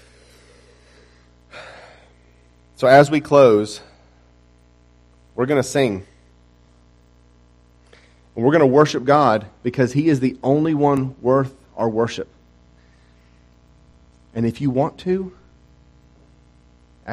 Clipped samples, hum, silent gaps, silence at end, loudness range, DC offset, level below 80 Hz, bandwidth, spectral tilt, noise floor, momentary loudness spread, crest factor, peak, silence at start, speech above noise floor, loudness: under 0.1%; 60 Hz at -50 dBFS; none; 0 s; 9 LU; under 0.1%; -54 dBFS; 13 kHz; -6.5 dB/octave; -52 dBFS; 22 LU; 20 dB; 0 dBFS; 1.55 s; 36 dB; -18 LUFS